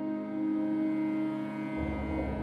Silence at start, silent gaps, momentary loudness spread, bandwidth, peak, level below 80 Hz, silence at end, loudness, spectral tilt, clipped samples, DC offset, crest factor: 0 s; none; 4 LU; 4.9 kHz; -20 dBFS; -46 dBFS; 0 s; -33 LUFS; -9 dB/octave; under 0.1%; under 0.1%; 12 dB